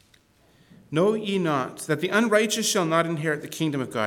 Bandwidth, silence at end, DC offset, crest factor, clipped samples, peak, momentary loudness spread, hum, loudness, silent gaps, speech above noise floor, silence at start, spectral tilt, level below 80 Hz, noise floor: 19 kHz; 0 s; under 0.1%; 18 dB; under 0.1%; -6 dBFS; 7 LU; none; -24 LUFS; none; 36 dB; 0.9 s; -4 dB/octave; -68 dBFS; -60 dBFS